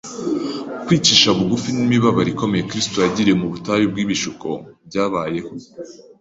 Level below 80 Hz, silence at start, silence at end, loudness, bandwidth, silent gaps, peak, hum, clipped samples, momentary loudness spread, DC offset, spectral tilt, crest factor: -50 dBFS; 0.05 s; 0.25 s; -18 LUFS; 8 kHz; none; 0 dBFS; none; under 0.1%; 16 LU; under 0.1%; -4 dB/octave; 20 dB